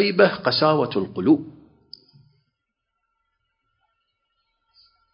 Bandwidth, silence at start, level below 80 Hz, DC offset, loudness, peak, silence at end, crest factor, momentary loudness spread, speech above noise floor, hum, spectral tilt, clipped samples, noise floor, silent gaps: 5.6 kHz; 0 s; -62 dBFS; under 0.1%; -20 LUFS; -2 dBFS; 3.65 s; 22 dB; 6 LU; 60 dB; none; -10 dB/octave; under 0.1%; -79 dBFS; none